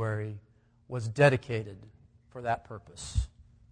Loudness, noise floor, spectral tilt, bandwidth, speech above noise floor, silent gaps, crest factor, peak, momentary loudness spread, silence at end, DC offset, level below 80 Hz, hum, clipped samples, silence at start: -31 LUFS; -62 dBFS; -6 dB/octave; 10 kHz; 33 dB; none; 22 dB; -10 dBFS; 23 LU; 0.3 s; under 0.1%; -44 dBFS; none; under 0.1%; 0 s